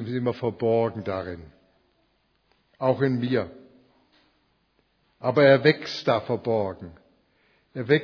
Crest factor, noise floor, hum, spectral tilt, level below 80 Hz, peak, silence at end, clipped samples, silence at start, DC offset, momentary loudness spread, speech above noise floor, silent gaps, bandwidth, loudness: 24 dB; -68 dBFS; none; -7.5 dB/octave; -62 dBFS; -2 dBFS; 0 s; under 0.1%; 0 s; under 0.1%; 19 LU; 45 dB; none; 5.4 kHz; -24 LUFS